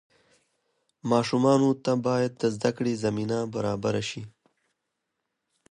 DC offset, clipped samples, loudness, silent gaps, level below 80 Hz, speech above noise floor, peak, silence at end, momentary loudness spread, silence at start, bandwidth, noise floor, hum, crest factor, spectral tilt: under 0.1%; under 0.1%; -26 LUFS; none; -64 dBFS; 56 dB; -10 dBFS; 1.4 s; 11 LU; 1.05 s; 10.5 kHz; -81 dBFS; none; 18 dB; -6 dB/octave